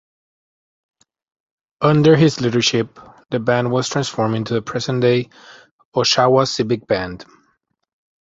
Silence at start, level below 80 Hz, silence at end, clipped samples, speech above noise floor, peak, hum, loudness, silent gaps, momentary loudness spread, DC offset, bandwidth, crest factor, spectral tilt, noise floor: 1.8 s; -52 dBFS; 1.05 s; under 0.1%; 50 dB; 0 dBFS; none; -17 LUFS; 5.71-5.79 s, 5.85-5.92 s; 11 LU; under 0.1%; 8 kHz; 18 dB; -5 dB/octave; -67 dBFS